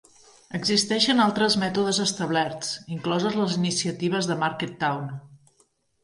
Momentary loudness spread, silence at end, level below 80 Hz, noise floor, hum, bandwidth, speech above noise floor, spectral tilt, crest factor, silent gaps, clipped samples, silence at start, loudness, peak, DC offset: 10 LU; 0.65 s; -66 dBFS; -66 dBFS; none; 11.5 kHz; 41 dB; -4 dB/octave; 18 dB; none; under 0.1%; 0.5 s; -24 LUFS; -8 dBFS; under 0.1%